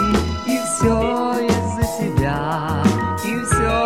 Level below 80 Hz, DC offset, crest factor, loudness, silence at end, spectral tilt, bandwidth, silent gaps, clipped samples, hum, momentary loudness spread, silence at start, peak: -32 dBFS; 0.4%; 16 dB; -19 LUFS; 0 s; -5.5 dB/octave; 16.5 kHz; none; under 0.1%; none; 4 LU; 0 s; -2 dBFS